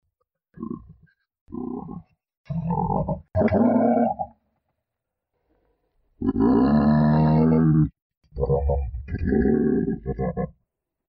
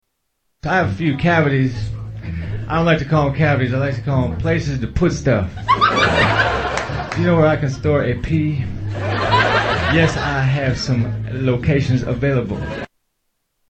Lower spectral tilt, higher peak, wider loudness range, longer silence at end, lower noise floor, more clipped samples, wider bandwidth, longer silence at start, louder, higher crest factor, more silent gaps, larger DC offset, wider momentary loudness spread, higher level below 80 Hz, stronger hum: first, -12.5 dB/octave vs -6.5 dB/octave; second, -8 dBFS vs 0 dBFS; first, 5 LU vs 2 LU; second, 0.7 s vs 0.85 s; first, -84 dBFS vs -71 dBFS; neither; second, 5.2 kHz vs 8.6 kHz; about the same, 0.6 s vs 0.65 s; second, -22 LUFS vs -18 LUFS; about the same, 14 dB vs 18 dB; first, 1.41-1.46 s, 2.37-2.44 s, 8.02-8.10 s, 8.17-8.21 s vs none; neither; first, 18 LU vs 11 LU; about the same, -38 dBFS vs -34 dBFS; neither